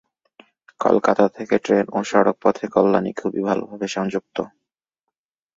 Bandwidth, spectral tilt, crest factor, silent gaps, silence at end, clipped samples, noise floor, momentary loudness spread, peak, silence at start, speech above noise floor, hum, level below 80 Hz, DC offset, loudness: 7.8 kHz; -6 dB/octave; 20 dB; none; 1.1 s; under 0.1%; -83 dBFS; 10 LU; -2 dBFS; 0.8 s; 63 dB; none; -62 dBFS; under 0.1%; -20 LUFS